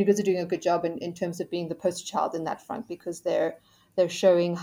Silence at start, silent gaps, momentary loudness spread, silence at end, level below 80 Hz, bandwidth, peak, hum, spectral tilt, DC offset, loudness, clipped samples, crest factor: 0 s; none; 12 LU; 0 s; -72 dBFS; 16 kHz; -8 dBFS; none; -5.5 dB/octave; under 0.1%; -28 LUFS; under 0.1%; 18 dB